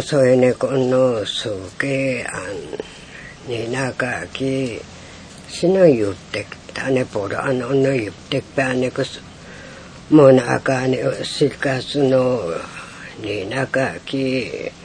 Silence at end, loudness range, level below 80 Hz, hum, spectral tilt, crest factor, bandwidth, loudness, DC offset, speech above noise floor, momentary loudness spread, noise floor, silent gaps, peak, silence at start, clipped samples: 0 s; 7 LU; -52 dBFS; none; -6 dB/octave; 20 dB; 10 kHz; -19 LUFS; under 0.1%; 20 dB; 21 LU; -38 dBFS; none; 0 dBFS; 0 s; under 0.1%